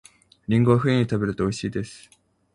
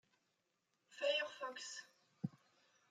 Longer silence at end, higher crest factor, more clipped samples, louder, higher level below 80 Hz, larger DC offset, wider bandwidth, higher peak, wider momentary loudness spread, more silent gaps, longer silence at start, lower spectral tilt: about the same, 0.55 s vs 0.6 s; about the same, 20 dB vs 20 dB; neither; first, -23 LUFS vs -44 LUFS; first, -50 dBFS vs under -90 dBFS; neither; first, 11 kHz vs 9.6 kHz; first, -4 dBFS vs -26 dBFS; about the same, 15 LU vs 13 LU; neither; second, 0.5 s vs 0.9 s; first, -7 dB/octave vs -3.5 dB/octave